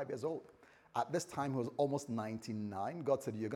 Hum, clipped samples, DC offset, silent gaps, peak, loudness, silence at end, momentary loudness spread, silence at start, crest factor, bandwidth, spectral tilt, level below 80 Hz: none; under 0.1%; under 0.1%; none; -20 dBFS; -39 LUFS; 0 s; 6 LU; 0 s; 18 dB; 16.5 kHz; -6 dB/octave; -80 dBFS